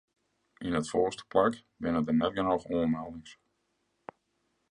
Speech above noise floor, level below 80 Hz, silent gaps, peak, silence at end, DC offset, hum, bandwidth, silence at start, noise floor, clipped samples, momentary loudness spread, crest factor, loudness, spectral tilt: 48 dB; -58 dBFS; none; -12 dBFS; 1.4 s; under 0.1%; none; 10.5 kHz; 0.6 s; -77 dBFS; under 0.1%; 23 LU; 20 dB; -30 LUFS; -6 dB/octave